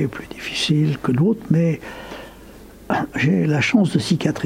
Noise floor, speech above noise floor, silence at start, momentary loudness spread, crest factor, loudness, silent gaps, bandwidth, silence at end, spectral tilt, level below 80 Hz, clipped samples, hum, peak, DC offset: -41 dBFS; 22 dB; 0 s; 17 LU; 16 dB; -19 LUFS; none; 15.5 kHz; 0 s; -6 dB/octave; -48 dBFS; under 0.1%; none; -4 dBFS; under 0.1%